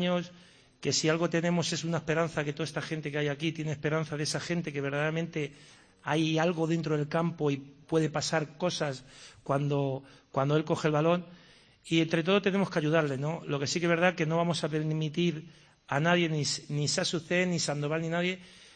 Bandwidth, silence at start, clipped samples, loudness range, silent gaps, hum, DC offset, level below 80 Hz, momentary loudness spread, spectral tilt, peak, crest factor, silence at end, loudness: 10 kHz; 0 s; under 0.1%; 3 LU; none; none; under 0.1%; -66 dBFS; 8 LU; -5 dB/octave; -12 dBFS; 18 dB; 0.1 s; -30 LUFS